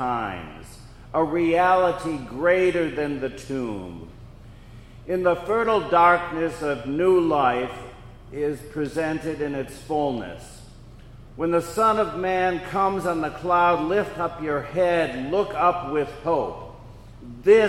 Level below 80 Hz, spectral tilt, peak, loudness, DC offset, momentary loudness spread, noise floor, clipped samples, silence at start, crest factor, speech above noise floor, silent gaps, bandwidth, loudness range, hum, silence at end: -48 dBFS; -6 dB/octave; -4 dBFS; -23 LUFS; under 0.1%; 18 LU; -44 dBFS; under 0.1%; 0 s; 20 dB; 21 dB; none; 15 kHz; 5 LU; none; 0 s